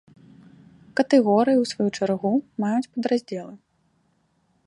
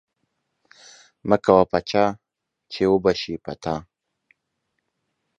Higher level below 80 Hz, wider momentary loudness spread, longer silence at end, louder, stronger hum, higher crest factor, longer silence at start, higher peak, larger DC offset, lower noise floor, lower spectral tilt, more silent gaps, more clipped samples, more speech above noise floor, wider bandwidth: second, -70 dBFS vs -52 dBFS; about the same, 13 LU vs 15 LU; second, 1.1 s vs 1.55 s; about the same, -22 LUFS vs -21 LUFS; neither; second, 18 dB vs 24 dB; second, 0.95 s vs 1.25 s; second, -6 dBFS vs 0 dBFS; neither; second, -67 dBFS vs -77 dBFS; about the same, -6 dB/octave vs -6 dB/octave; neither; neither; second, 45 dB vs 56 dB; first, 11 kHz vs 9.2 kHz